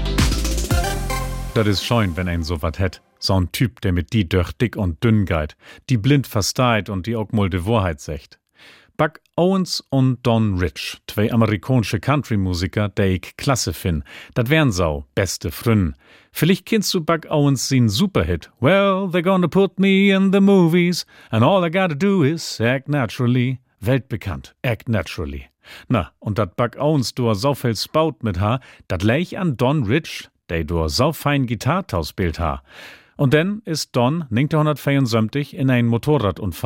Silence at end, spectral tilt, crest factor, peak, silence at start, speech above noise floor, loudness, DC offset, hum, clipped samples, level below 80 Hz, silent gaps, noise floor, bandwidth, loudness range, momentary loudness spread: 0 s; -6 dB/octave; 18 dB; -2 dBFS; 0 s; 30 dB; -20 LUFS; under 0.1%; none; under 0.1%; -36 dBFS; none; -49 dBFS; 17 kHz; 5 LU; 9 LU